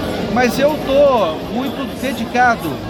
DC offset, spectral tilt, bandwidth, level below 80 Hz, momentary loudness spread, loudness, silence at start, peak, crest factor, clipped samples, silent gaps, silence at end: under 0.1%; -5 dB/octave; 18 kHz; -38 dBFS; 9 LU; -16 LUFS; 0 s; -2 dBFS; 14 dB; under 0.1%; none; 0 s